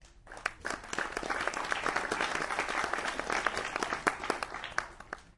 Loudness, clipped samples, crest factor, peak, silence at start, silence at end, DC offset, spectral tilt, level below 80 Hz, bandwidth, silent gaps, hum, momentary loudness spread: -34 LUFS; under 0.1%; 26 dB; -10 dBFS; 0 s; 0.05 s; under 0.1%; -2 dB/octave; -56 dBFS; 11.5 kHz; none; none; 7 LU